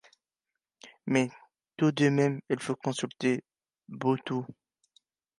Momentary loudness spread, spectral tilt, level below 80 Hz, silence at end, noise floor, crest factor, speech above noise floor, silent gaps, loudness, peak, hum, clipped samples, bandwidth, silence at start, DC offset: 15 LU; -6 dB/octave; -78 dBFS; 0.85 s; -88 dBFS; 20 dB; 60 dB; none; -29 LUFS; -10 dBFS; none; under 0.1%; 11.5 kHz; 0.85 s; under 0.1%